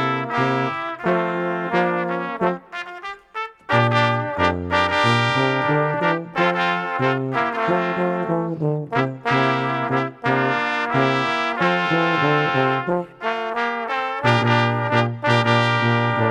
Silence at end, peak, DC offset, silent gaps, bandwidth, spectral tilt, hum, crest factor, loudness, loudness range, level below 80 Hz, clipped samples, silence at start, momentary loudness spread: 0 s; -2 dBFS; under 0.1%; none; 10 kHz; -6.5 dB/octave; none; 18 dB; -20 LUFS; 3 LU; -56 dBFS; under 0.1%; 0 s; 7 LU